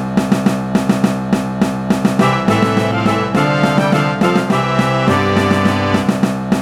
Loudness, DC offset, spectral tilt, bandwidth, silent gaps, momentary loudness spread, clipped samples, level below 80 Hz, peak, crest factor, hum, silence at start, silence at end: -15 LUFS; under 0.1%; -6.5 dB/octave; 15 kHz; none; 3 LU; under 0.1%; -42 dBFS; 0 dBFS; 14 dB; none; 0 s; 0 s